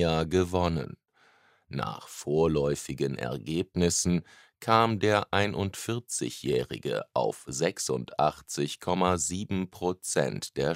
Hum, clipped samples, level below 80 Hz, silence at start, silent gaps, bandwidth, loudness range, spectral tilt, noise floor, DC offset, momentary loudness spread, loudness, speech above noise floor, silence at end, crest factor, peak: none; under 0.1%; -52 dBFS; 0 s; none; 16 kHz; 3 LU; -4.5 dB/octave; -63 dBFS; under 0.1%; 9 LU; -29 LUFS; 35 dB; 0 s; 24 dB; -4 dBFS